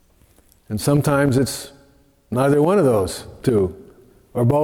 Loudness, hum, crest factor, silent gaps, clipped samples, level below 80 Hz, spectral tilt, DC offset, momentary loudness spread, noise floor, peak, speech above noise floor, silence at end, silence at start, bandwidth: -19 LUFS; none; 14 dB; none; under 0.1%; -46 dBFS; -6.5 dB/octave; under 0.1%; 14 LU; -54 dBFS; -6 dBFS; 37 dB; 0 s; 0.7 s; 17.5 kHz